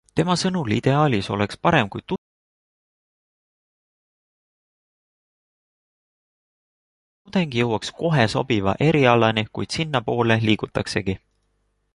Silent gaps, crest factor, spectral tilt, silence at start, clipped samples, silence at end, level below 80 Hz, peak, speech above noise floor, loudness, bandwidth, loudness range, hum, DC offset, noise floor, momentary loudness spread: 2.18-7.25 s; 20 dB; -6 dB/octave; 0.15 s; under 0.1%; 0.8 s; -50 dBFS; -2 dBFS; 49 dB; -21 LUFS; 11.5 kHz; 11 LU; none; under 0.1%; -69 dBFS; 9 LU